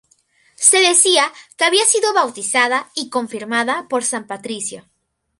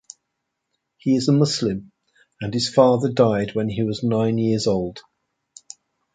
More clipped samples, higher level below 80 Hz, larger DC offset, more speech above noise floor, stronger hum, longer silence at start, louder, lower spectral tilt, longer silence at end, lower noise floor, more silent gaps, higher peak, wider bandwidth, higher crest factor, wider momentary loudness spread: neither; second, -70 dBFS vs -54 dBFS; neither; second, 40 dB vs 59 dB; neither; second, 0.6 s vs 1.05 s; first, -15 LUFS vs -20 LUFS; second, 0 dB/octave vs -6 dB/octave; second, 0.6 s vs 1.15 s; second, -58 dBFS vs -78 dBFS; neither; about the same, 0 dBFS vs -2 dBFS; first, 16 kHz vs 9.4 kHz; about the same, 18 dB vs 20 dB; about the same, 14 LU vs 15 LU